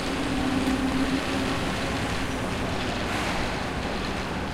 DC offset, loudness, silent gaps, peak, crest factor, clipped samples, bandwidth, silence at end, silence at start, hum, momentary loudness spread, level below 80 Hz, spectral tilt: under 0.1%; -27 LUFS; none; -12 dBFS; 14 dB; under 0.1%; 16 kHz; 0 s; 0 s; none; 4 LU; -38 dBFS; -5 dB/octave